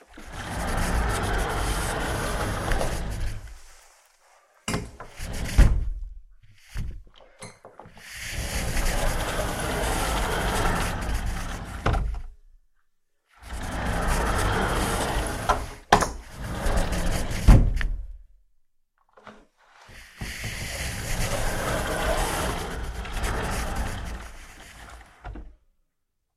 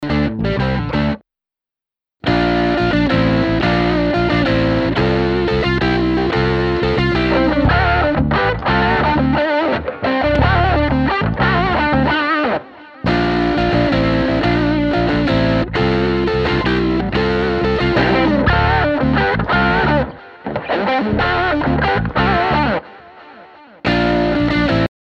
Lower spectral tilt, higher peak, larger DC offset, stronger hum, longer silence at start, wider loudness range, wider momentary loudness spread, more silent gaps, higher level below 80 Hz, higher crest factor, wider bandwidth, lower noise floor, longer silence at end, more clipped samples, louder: second, -4.5 dB/octave vs -7.5 dB/octave; about the same, -2 dBFS vs -2 dBFS; neither; neither; about the same, 0.1 s vs 0 s; first, 8 LU vs 2 LU; first, 20 LU vs 5 LU; neither; about the same, -30 dBFS vs -28 dBFS; first, 26 dB vs 14 dB; first, 15 kHz vs 8 kHz; second, -76 dBFS vs -89 dBFS; first, 0.9 s vs 0.3 s; neither; second, -27 LUFS vs -16 LUFS